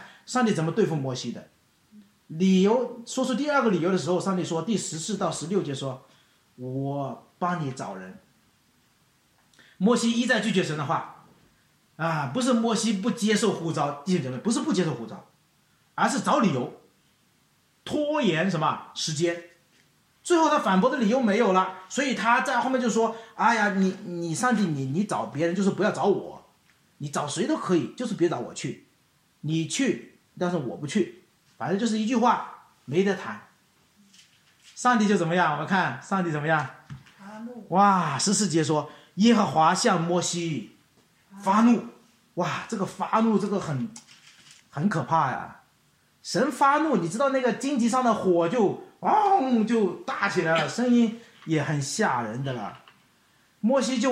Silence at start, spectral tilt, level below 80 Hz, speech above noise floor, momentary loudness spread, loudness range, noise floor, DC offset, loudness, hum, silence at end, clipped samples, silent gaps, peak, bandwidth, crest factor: 0 s; -5 dB/octave; -72 dBFS; 40 dB; 14 LU; 6 LU; -65 dBFS; under 0.1%; -25 LUFS; none; 0 s; under 0.1%; none; -8 dBFS; 13 kHz; 18 dB